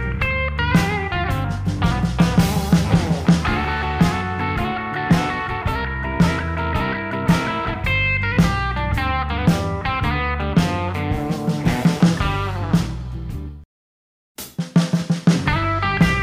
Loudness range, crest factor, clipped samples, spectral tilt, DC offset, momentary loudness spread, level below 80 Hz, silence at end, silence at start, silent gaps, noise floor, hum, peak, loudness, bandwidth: 3 LU; 18 dB; under 0.1%; -6 dB/octave; under 0.1%; 6 LU; -30 dBFS; 0 s; 0 s; 13.65-14.35 s; under -90 dBFS; none; -2 dBFS; -20 LUFS; 16 kHz